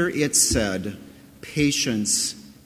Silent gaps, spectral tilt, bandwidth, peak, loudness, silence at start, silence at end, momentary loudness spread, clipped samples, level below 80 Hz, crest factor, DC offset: none; -2.5 dB/octave; 16 kHz; -6 dBFS; -21 LUFS; 0 s; 0.15 s; 13 LU; under 0.1%; -42 dBFS; 18 dB; under 0.1%